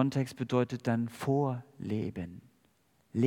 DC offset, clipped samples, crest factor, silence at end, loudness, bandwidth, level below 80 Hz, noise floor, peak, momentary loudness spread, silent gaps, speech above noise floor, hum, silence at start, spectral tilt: under 0.1%; under 0.1%; 20 dB; 0 s; -33 LUFS; 16 kHz; -70 dBFS; -70 dBFS; -12 dBFS; 11 LU; none; 38 dB; none; 0 s; -7.5 dB/octave